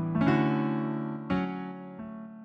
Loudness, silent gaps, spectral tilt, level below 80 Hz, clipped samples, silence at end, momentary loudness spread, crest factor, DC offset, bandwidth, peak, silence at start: -29 LUFS; none; -9 dB/octave; -58 dBFS; under 0.1%; 0 s; 16 LU; 16 dB; under 0.1%; 6.2 kHz; -14 dBFS; 0 s